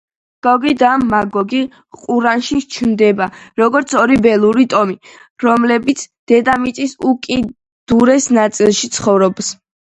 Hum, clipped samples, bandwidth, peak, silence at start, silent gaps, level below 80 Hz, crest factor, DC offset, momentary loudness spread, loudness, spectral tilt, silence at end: none; under 0.1%; 10.5 kHz; 0 dBFS; 0.45 s; 5.30-5.36 s, 6.19-6.27 s, 7.72-7.87 s; -48 dBFS; 14 dB; under 0.1%; 9 LU; -14 LUFS; -4.5 dB/octave; 0.4 s